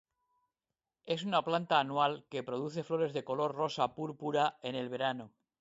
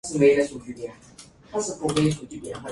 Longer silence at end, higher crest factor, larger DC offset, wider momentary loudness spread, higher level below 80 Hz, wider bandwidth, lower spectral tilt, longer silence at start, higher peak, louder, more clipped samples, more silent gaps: first, 0.35 s vs 0 s; about the same, 22 dB vs 18 dB; neither; second, 8 LU vs 18 LU; second, -78 dBFS vs -54 dBFS; second, 8 kHz vs 11.5 kHz; about the same, -5.5 dB/octave vs -5.5 dB/octave; first, 1.05 s vs 0.05 s; second, -14 dBFS vs -6 dBFS; second, -34 LUFS vs -23 LUFS; neither; neither